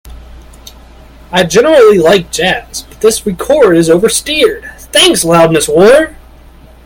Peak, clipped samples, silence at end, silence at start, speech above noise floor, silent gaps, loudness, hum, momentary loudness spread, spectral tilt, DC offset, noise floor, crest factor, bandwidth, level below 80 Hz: 0 dBFS; 0.6%; 0.75 s; 0.05 s; 29 dB; none; -8 LUFS; none; 10 LU; -3.5 dB/octave; under 0.1%; -36 dBFS; 10 dB; over 20 kHz; -34 dBFS